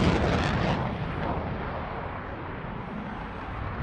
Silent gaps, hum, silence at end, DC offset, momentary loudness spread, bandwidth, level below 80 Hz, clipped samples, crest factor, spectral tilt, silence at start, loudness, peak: none; none; 0 s; under 0.1%; 11 LU; 10.5 kHz; -40 dBFS; under 0.1%; 18 dB; -7 dB/octave; 0 s; -31 LUFS; -10 dBFS